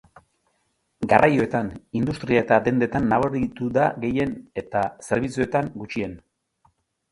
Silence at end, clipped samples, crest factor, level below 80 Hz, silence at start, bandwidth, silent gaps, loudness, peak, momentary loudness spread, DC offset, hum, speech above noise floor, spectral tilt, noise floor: 0.95 s; under 0.1%; 22 dB; -50 dBFS; 1 s; 11.5 kHz; none; -23 LUFS; 0 dBFS; 11 LU; under 0.1%; none; 49 dB; -7 dB/octave; -71 dBFS